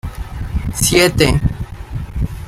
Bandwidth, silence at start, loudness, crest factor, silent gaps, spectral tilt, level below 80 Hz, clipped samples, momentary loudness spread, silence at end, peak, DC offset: 16 kHz; 0.05 s; -15 LUFS; 16 dB; none; -4 dB/octave; -26 dBFS; under 0.1%; 16 LU; 0 s; 0 dBFS; under 0.1%